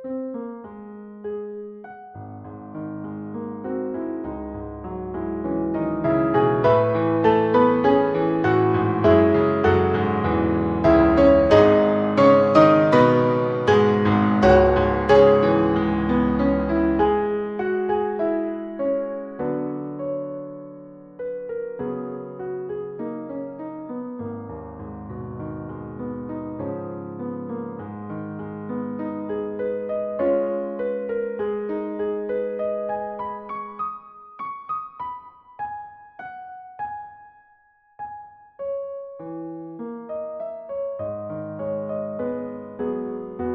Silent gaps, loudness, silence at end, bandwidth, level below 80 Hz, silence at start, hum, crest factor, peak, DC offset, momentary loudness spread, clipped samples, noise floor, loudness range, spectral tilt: none; -22 LUFS; 0 s; 7.4 kHz; -42 dBFS; 0 s; none; 20 dB; -2 dBFS; under 0.1%; 19 LU; under 0.1%; -59 dBFS; 18 LU; -8.5 dB/octave